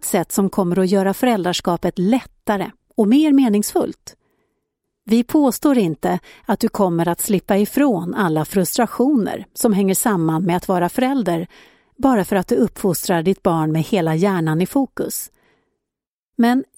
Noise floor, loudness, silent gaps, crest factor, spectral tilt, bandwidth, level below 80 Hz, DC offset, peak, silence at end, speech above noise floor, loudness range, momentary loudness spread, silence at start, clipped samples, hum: -85 dBFS; -18 LUFS; 16.07-16.33 s; 16 dB; -5.5 dB/octave; 16.5 kHz; -50 dBFS; under 0.1%; -2 dBFS; 0.15 s; 68 dB; 2 LU; 7 LU; 0 s; under 0.1%; none